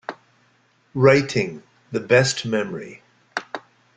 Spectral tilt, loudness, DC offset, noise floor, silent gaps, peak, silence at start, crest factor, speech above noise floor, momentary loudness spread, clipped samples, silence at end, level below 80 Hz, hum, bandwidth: -5 dB/octave; -21 LUFS; under 0.1%; -61 dBFS; none; -2 dBFS; 0.1 s; 22 dB; 42 dB; 21 LU; under 0.1%; 0.35 s; -58 dBFS; none; 9.6 kHz